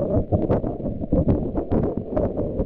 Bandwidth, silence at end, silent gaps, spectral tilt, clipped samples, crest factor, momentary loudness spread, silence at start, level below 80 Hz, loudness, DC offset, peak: 4.1 kHz; 0 s; none; -12.5 dB/octave; under 0.1%; 16 dB; 4 LU; 0 s; -32 dBFS; -24 LUFS; under 0.1%; -6 dBFS